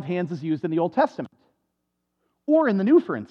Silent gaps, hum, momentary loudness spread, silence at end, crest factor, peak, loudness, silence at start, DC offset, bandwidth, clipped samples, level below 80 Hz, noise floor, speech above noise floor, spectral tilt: none; none; 17 LU; 0.05 s; 16 dB; -8 dBFS; -22 LUFS; 0 s; under 0.1%; 6.6 kHz; under 0.1%; -78 dBFS; -78 dBFS; 56 dB; -9 dB/octave